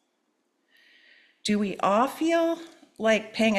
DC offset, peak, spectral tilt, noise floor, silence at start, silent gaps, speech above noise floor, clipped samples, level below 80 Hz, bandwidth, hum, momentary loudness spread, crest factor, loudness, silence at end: under 0.1%; -10 dBFS; -4.5 dB/octave; -74 dBFS; 1.45 s; none; 50 dB; under 0.1%; -68 dBFS; 14 kHz; none; 6 LU; 16 dB; -26 LUFS; 0 s